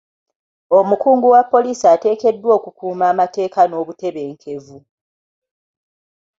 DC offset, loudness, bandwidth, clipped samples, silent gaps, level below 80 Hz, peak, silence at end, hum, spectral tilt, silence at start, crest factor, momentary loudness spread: under 0.1%; -15 LUFS; 7.8 kHz; under 0.1%; none; -66 dBFS; -2 dBFS; 1.6 s; none; -6 dB/octave; 0.7 s; 16 dB; 16 LU